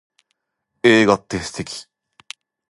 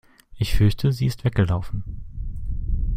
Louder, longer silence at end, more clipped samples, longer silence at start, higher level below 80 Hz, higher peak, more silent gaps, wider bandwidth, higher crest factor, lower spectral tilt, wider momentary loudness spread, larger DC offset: first, -17 LUFS vs -24 LUFS; first, 0.9 s vs 0 s; neither; first, 0.85 s vs 0.3 s; second, -52 dBFS vs -28 dBFS; first, 0 dBFS vs -4 dBFS; neither; second, 11.5 kHz vs 16 kHz; about the same, 20 dB vs 18 dB; second, -4.5 dB/octave vs -7 dB/octave; first, 25 LU vs 15 LU; neither